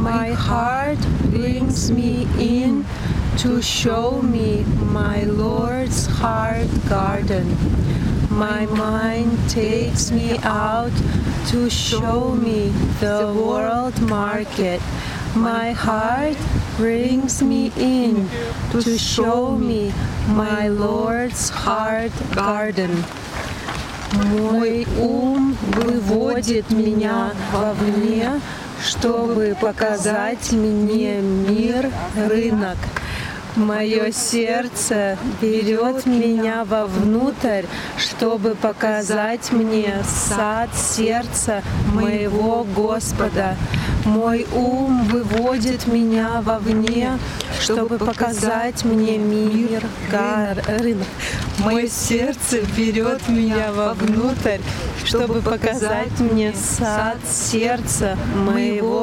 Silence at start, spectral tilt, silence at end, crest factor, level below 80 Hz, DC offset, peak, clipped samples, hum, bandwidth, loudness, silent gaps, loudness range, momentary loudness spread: 0 s; -5 dB/octave; 0 s; 18 dB; -32 dBFS; under 0.1%; 0 dBFS; under 0.1%; none; 16.5 kHz; -20 LUFS; none; 1 LU; 4 LU